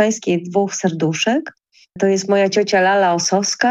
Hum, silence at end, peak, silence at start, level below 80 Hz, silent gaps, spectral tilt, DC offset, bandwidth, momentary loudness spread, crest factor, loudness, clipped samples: none; 0 s; -2 dBFS; 0 s; -64 dBFS; none; -4 dB/octave; under 0.1%; 10.5 kHz; 6 LU; 14 dB; -17 LUFS; under 0.1%